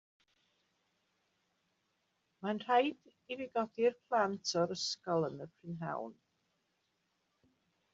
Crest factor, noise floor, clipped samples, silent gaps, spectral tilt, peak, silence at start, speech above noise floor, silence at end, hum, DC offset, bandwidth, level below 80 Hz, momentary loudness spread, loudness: 22 dB; -81 dBFS; under 0.1%; none; -3.5 dB/octave; -18 dBFS; 2.4 s; 45 dB; 1.8 s; none; under 0.1%; 7.4 kHz; -82 dBFS; 13 LU; -36 LUFS